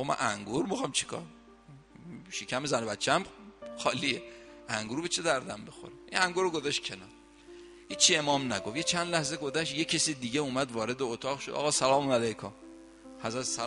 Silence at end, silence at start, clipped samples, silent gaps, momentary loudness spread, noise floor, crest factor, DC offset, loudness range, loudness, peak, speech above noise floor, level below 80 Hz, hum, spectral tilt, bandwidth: 0 s; 0 s; under 0.1%; none; 20 LU; -54 dBFS; 26 dB; under 0.1%; 5 LU; -30 LUFS; -6 dBFS; 23 dB; -64 dBFS; none; -2.5 dB/octave; 11.5 kHz